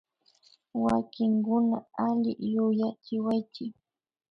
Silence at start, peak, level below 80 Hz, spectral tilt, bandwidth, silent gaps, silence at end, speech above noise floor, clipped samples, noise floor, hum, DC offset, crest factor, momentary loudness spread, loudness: 0.75 s; -14 dBFS; -64 dBFS; -8.5 dB/octave; 5.8 kHz; none; 0.6 s; 36 dB; under 0.1%; -63 dBFS; none; under 0.1%; 16 dB; 11 LU; -28 LUFS